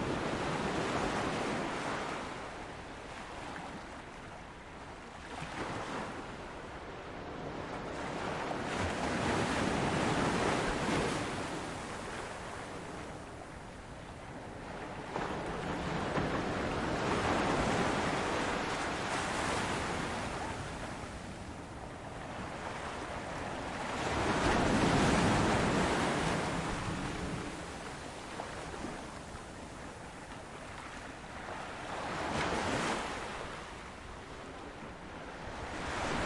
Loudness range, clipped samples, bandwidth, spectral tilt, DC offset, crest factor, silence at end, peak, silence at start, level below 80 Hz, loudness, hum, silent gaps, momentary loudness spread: 12 LU; under 0.1%; 11.5 kHz; -4.5 dB/octave; under 0.1%; 20 dB; 0 s; -16 dBFS; 0 s; -52 dBFS; -36 LUFS; none; none; 15 LU